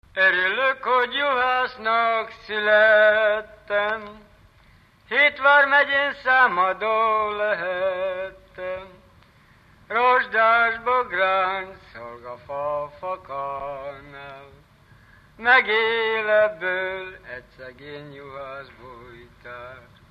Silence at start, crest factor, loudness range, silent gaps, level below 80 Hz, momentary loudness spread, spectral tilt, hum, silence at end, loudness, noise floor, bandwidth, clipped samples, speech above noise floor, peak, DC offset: 0.15 s; 18 dB; 11 LU; none; -58 dBFS; 22 LU; -4.5 dB/octave; none; 0.3 s; -20 LUFS; -54 dBFS; 6 kHz; under 0.1%; 33 dB; -4 dBFS; under 0.1%